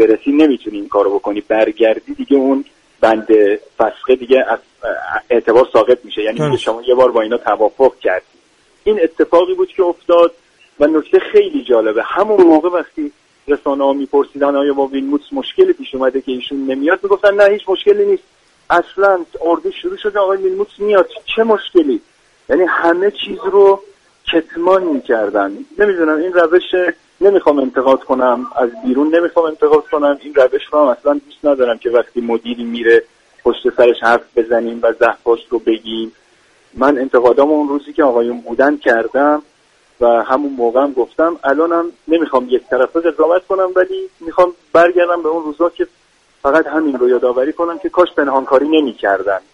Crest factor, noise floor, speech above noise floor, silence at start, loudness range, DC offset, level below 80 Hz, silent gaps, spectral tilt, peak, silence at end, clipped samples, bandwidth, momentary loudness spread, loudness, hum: 14 dB; -53 dBFS; 40 dB; 0 s; 2 LU; under 0.1%; -52 dBFS; none; -6 dB/octave; 0 dBFS; 0.15 s; under 0.1%; 9.6 kHz; 8 LU; -14 LUFS; none